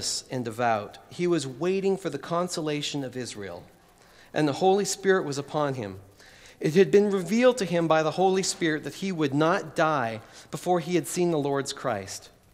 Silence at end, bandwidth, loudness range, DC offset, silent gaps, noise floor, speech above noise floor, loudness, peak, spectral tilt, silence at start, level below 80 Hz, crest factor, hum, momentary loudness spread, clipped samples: 0.25 s; 16 kHz; 5 LU; under 0.1%; none; -55 dBFS; 29 dB; -26 LUFS; -8 dBFS; -4.5 dB/octave; 0 s; -64 dBFS; 20 dB; none; 13 LU; under 0.1%